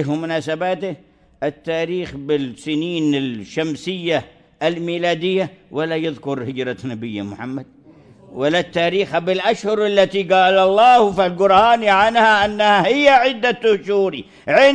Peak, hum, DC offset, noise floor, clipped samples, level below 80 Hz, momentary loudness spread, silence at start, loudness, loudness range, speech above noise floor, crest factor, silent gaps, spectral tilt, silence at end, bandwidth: -2 dBFS; none; under 0.1%; -46 dBFS; under 0.1%; -54 dBFS; 14 LU; 0 s; -17 LUFS; 10 LU; 29 dB; 16 dB; none; -5 dB/octave; 0 s; 10 kHz